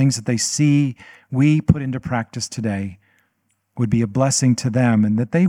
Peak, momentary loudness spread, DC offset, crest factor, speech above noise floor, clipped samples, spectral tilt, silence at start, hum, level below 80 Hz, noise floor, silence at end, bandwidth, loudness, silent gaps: 0 dBFS; 10 LU; under 0.1%; 18 dB; 51 dB; under 0.1%; -5.5 dB/octave; 0 s; none; -46 dBFS; -69 dBFS; 0 s; 14 kHz; -19 LUFS; none